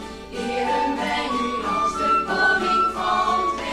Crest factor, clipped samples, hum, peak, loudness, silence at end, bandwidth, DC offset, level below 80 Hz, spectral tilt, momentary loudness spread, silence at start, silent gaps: 14 dB; under 0.1%; none; -8 dBFS; -21 LUFS; 0 s; 15 kHz; under 0.1%; -46 dBFS; -3.5 dB/octave; 6 LU; 0 s; none